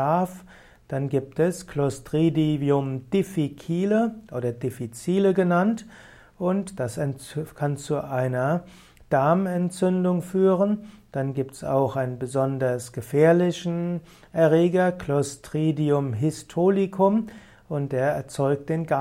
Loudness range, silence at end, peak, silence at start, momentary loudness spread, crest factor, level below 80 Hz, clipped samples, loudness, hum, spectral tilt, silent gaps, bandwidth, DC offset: 3 LU; 0 s; -6 dBFS; 0 s; 10 LU; 18 dB; -58 dBFS; under 0.1%; -24 LUFS; none; -7.5 dB/octave; none; 15.5 kHz; under 0.1%